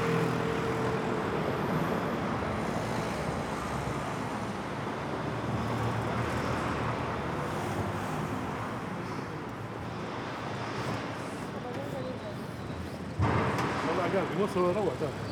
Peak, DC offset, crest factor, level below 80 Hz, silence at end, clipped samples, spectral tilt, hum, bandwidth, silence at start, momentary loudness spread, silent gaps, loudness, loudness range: -16 dBFS; under 0.1%; 16 dB; -52 dBFS; 0 s; under 0.1%; -6.5 dB/octave; none; over 20 kHz; 0 s; 8 LU; none; -33 LUFS; 5 LU